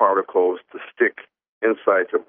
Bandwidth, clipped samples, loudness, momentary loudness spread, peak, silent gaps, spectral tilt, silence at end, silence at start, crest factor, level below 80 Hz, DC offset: 3.6 kHz; under 0.1%; -21 LUFS; 9 LU; -4 dBFS; 1.48-1.61 s; -2.5 dB/octave; 0.1 s; 0 s; 18 dB; -78 dBFS; under 0.1%